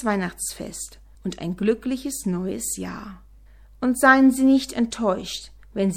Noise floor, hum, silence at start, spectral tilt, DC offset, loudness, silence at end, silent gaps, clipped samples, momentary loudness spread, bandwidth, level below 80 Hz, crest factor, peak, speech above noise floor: -48 dBFS; none; 0 s; -4.5 dB/octave; under 0.1%; -22 LUFS; 0 s; none; under 0.1%; 19 LU; 17 kHz; -48 dBFS; 22 dB; -2 dBFS; 26 dB